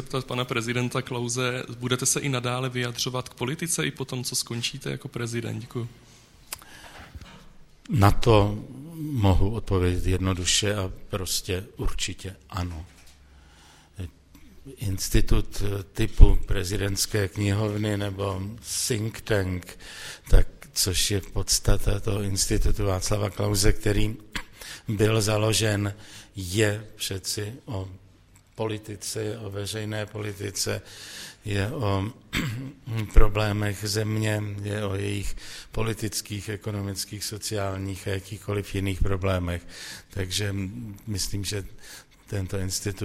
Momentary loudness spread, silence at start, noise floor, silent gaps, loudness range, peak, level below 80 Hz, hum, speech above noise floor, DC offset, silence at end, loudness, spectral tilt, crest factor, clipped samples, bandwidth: 15 LU; 0 s; -55 dBFS; none; 7 LU; 0 dBFS; -30 dBFS; none; 31 dB; under 0.1%; 0 s; -27 LUFS; -4.5 dB/octave; 26 dB; under 0.1%; 16 kHz